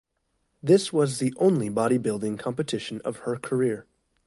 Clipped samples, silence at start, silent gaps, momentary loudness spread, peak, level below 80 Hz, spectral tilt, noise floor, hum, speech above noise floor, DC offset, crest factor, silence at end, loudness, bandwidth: under 0.1%; 0.65 s; none; 11 LU; -8 dBFS; -64 dBFS; -6 dB/octave; -74 dBFS; none; 50 dB; under 0.1%; 18 dB; 0.45 s; -25 LUFS; 11.5 kHz